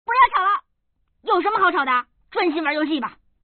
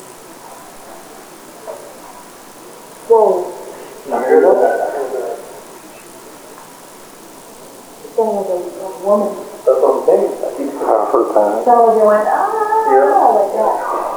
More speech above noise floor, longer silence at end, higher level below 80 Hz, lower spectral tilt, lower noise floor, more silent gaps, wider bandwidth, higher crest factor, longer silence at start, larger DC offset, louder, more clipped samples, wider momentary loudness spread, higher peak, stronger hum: first, 48 dB vs 26 dB; first, 0.35 s vs 0 s; about the same, -58 dBFS vs -60 dBFS; second, 0.5 dB/octave vs -5 dB/octave; first, -69 dBFS vs -37 dBFS; neither; second, 4.5 kHz vs over 20 kHz; about the same, 18 dB vs 16 dB; about the same, 0.1 s vs 0 s; neither; second, -20 LUFS vs -14 LUFS; neither; second, 11 LU vs 25 LU; second, -4 dBFS vs 0 dBFS; neither